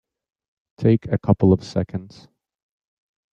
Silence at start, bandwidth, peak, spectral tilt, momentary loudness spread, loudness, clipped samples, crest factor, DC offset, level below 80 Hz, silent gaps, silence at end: 0.8 s; 7.8 kHz; -4 dBFS; -9 dB/octave; 11 LU; -20 LUFS; under 0.1%; 20 dB; under 0.1%; -52 dBFS; none; 1.25 s